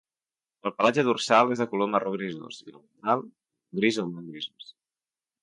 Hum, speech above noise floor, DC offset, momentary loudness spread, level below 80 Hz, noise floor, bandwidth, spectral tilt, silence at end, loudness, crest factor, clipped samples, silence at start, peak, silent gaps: none; over 64 dB; under 0.1%; 16 LU; -74 dBFS; under -90 dBFS; 11.5 kHz; -5 dB/octave; 0.8 s; -26 LUFS; 22 dB; under 0.1%; 0.65 s; -6 dBFS; none